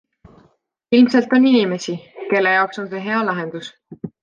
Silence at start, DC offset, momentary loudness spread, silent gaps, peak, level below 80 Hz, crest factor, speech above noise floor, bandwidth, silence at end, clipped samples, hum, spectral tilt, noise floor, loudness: 0.9 s; under 0.1%; 19 LU; none; -4 dBFS; -64 dBFS; 16 dB; 43 dB; 7.2 kHz; 0.15 s; under 0.1%; none; -5.5 dB/octave; -60 dBFS; -17 LUFS